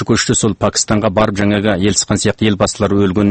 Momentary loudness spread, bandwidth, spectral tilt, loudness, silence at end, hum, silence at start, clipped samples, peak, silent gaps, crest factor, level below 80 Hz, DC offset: 2 LU; 8.8 kHz; -4.5 dB/octave; -14 LUFS; 0 s; none; 0 s; under 0.1%; 0 dBFS; none; 14 dB; -38 dBFS; under 0.1%